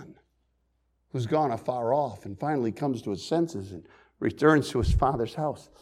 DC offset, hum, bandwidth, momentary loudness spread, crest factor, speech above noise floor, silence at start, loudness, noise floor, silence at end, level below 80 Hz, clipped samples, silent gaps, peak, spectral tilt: under 0.1%; none; 14.5 kHz; 11 LU; 20 dB; 45 dB; 0 s; -28 LUFS; -72 dBFS; 0.2 s; -40 dBFS; under 0.1%; none; -8 dBFS; -7 dB/octave